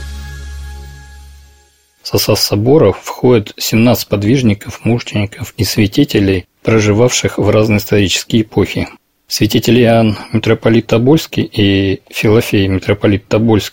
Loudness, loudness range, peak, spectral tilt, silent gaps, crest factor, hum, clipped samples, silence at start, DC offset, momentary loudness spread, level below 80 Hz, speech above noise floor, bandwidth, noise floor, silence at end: -12 LUFS; 2 LU; 0 dBFS; -5.5 dB/octave; none; 12 dB; none; under 0.1%; 0 s; 0.8%; 10 LU; -36 dBFS; 39 dB; 17.5 kHz; -50 dBFS; 0.05 s